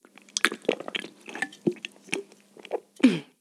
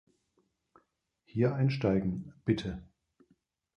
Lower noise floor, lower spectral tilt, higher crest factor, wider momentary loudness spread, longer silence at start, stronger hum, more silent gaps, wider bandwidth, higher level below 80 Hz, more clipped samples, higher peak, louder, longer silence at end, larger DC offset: second, -50 dBFS vs -76 dBFS; second, -3.5 dB/octave vs -8.5 dB/octave; first, 30 dB vs 20 dB; about the same, 14 LU vs 12 LU; second, 0.35 s vs 1.35 s; neither; neither; first, 14 kHz vs 8.2 kHz; second, -76 dBFS vs -56 dBFS; neither; first, 0 dBFS vs -14 dBFS; first, -28 LUFS vs -32 LUFS; second, 0.2 s vs 0.95 s; neither